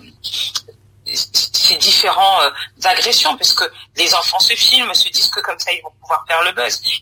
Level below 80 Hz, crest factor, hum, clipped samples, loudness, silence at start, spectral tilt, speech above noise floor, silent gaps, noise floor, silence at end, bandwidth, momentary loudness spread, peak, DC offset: -56 dBFS; 16 dB; none; under 0.1%; -13 LUFS; 0.25 s; 1 dB/octave; 23 dB; none; -39 dBFS; 0 s; 16 kHz; 11 LU; 0 dBFS; under 0.1%